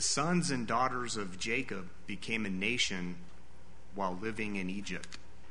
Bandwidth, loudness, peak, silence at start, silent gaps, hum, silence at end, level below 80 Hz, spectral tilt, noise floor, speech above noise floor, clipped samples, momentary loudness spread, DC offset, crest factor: 10.5 kHz; -35 LUFS; -16 dBFS; 0 s; none; none; 0 s; -58 dBFS; -3.5 dB/octave; -57 dBFS; 22 dB; under 0.1%; 13 LU; 1%; 20 dB